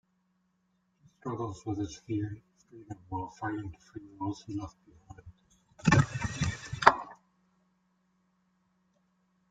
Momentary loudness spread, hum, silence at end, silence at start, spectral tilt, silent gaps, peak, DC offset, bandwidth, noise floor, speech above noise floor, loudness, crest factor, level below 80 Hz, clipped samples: 23 LU; none; 2.35 s; 1.25 s; -5.5 dB/octave; none; 0 dBFS; under 0.1%; 9.2 kHz; -75 dBFS; 37 dB; -31 LUFS; 34 dB; -56 dBFS; under 0.1%